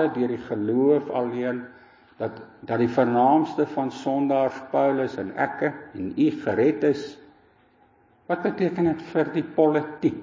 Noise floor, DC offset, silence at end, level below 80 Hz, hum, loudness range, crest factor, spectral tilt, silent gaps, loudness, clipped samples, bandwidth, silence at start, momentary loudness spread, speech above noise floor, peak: -59 dBFS; under 0.1%; 0 s; -62 dBFS; none; 3 LU; 18 dB; -8 dB/octave; none; -24 LUFS; under 0.1%; 7.6 kHz; 0 s; 12 LU; 36 dB; -8 dBFS